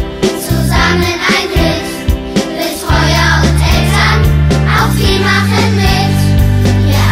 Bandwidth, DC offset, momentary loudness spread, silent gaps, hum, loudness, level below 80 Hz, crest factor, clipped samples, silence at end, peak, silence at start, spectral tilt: 16 kHz; under 0.1%; 6 LU; none; none; -11 LUFS; -18 dBFS; 10 dB; under 0.1%; 0 s; 0 dBFS; 0 s; -5 dB/octave